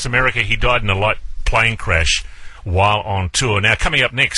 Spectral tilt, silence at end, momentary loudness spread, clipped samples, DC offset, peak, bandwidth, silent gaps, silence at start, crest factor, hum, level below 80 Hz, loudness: -3.5 dB/octave; 0 s; 5 LU; under 0.1%; under 0.1%; 0 dBFS; 11.5 kHz; none; 0 s; 16 dB; none; -26 dBFS; -16 LUFS